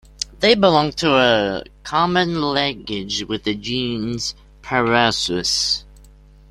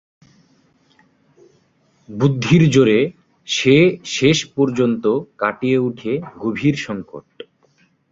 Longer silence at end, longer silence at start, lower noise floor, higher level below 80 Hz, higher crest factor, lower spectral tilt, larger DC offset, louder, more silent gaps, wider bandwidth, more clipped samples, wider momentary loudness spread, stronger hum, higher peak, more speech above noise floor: second, 0.7 s vs 0.9 s; second, 0.2 s vs 2.1 s; second, -46 dBFS vs -59 dBFS; first, -46 dBFS vs -52 dBFS; about the same, 18 dB vs 18 dB; second, -3.5 dB/octave vs -6 dB/octave; neither; about the same, -18 LUFS vs -17 LUFS; neither; first, 15 kHz vs 7.8 kHz; neither; about the same, 10 LU vs 12 LU; neither; about the same, -2 dBFS vs 0 dBFS; second, 27 dB vs 43 dB